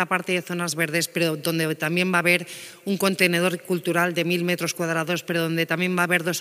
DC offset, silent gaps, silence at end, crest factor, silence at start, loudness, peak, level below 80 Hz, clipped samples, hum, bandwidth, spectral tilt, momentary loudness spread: under 0.1%; none; 0 s; 20 dB; 0 s; -23 LUFS; -4 dBFS; -72 dBFS; under 0.1%; none; 16 kHz; -4 dB/octave; 5 LU